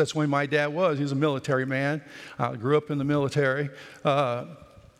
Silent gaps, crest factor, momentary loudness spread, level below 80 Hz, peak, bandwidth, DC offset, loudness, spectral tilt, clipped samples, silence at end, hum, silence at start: none; 18 dB; 9 LU; -66 dBFS; -8 dBFS; 12 kHz; under 0.1%; -26 LUFS; -6.5 dB/octave; under 0.1%; 0.35 s; none; 0 s